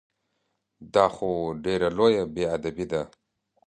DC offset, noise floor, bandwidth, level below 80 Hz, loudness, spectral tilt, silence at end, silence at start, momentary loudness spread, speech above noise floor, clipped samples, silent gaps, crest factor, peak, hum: under 0.1%; -77 dBFS; 10 kHz; -54 dBFS; -25 LUFS; -6 dB/octave; 0.6 s; 0.8 s; 8 LU; 52 dB; under 0.1%; none; 22 dB; -4 dBFS; none